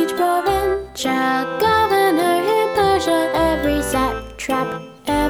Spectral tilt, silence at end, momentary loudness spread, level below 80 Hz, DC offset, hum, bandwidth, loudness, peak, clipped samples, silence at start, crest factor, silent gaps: -4.5 dB/octave; 0 s; 7 LU; -36 dBFS; under 0.1%; none; over 20 kHz; -18 LUFS; -4 dBFS; under 0.1%; 0 s; 14 dB; none